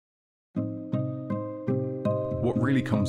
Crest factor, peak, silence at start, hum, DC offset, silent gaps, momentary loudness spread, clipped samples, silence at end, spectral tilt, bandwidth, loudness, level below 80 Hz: 16 dB; -12 dBFS; 0.55 s; none; under 0.1%; none; 8 LU; under 0.1%; 0 s; -8.5 dB/octave; 10 kHz; -29 LUFS; -60 dBFS